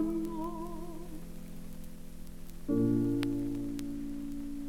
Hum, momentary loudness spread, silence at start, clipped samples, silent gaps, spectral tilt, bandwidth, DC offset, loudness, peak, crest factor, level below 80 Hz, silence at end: none; 20 LU; 0 s; under 0.1%; none; -7.5 dB/octave; 17 kHz; under 0.1%; -35 LUFS; -16 dBFS; 20 dB; -46 dBFS; 0 s